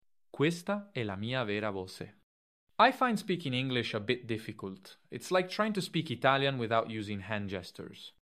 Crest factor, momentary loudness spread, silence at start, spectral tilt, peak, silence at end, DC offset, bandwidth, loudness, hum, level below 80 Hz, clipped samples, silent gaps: 24 dB; 18 LU; 0.35 s; -5.5 dB/octave; -10 dBFS; 0.1 s; under 0.1%; 15 kHz; -32 LUFS; none; -72 dBFS; under 0.1%; 2.23-2.67 s